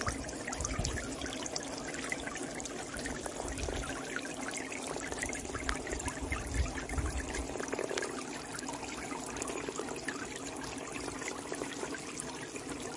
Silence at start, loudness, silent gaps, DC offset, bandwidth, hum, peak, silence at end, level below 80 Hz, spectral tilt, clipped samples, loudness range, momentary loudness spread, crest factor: 0 s; -38 LUFS; none; under 0.1%; 11.5 kHz; none; -12 dBFS; 0 s; -46 dBFS; -3.5 dB/octave; under 0.1%; 2 LU; 4 LU; 28 dB